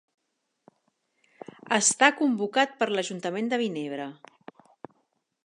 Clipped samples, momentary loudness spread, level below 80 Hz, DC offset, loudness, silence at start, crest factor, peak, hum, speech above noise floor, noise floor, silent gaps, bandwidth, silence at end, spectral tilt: under 0.1%; 17 LU; -84 dBFS; under 0.1%; -25 LUFS; 1.65 s; 26 dB; -2 dBFS; none; 48 dB; -74 dBFS; none; 11.5 kHz; 1.3 s; -2 dB/octave